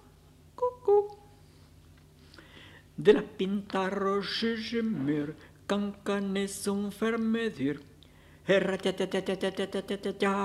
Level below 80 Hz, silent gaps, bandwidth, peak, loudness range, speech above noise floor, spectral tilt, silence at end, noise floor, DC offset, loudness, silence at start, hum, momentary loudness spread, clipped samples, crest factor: -62 dBFS; none; 13.5 kHz; -8 dBFS; 2 LU; 27 dB; -5.5 dB/octave; 0 s; -57 dBFS; under 0.1%; -30 LUFS; 0.6 s; none; 13 LU; under 0.1%; 24 dB